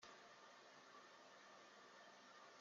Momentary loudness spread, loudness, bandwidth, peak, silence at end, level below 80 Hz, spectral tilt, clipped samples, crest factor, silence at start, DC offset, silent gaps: 1 LU; -64 LUFS; 7.4 kHz; -46 dBFS; 0 s; under -90 dBFS; 0 dB/octave; under 0.1%; 20 dB; 0 s; under 0.1%; none